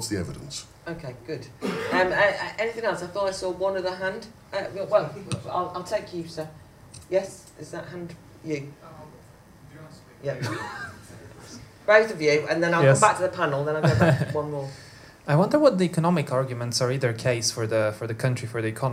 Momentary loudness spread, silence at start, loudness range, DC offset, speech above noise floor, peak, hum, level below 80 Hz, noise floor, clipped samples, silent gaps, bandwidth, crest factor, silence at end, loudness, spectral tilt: 19 LU; 0 s; 14 LU; under 0.1%; 25 dB; -2 dBFS; none; -58 dBFS; -50 dBFS; under 0.1%; none; 15.5 kHz; 24 dB; 0 s; -25 LUFS; -5 dB/octave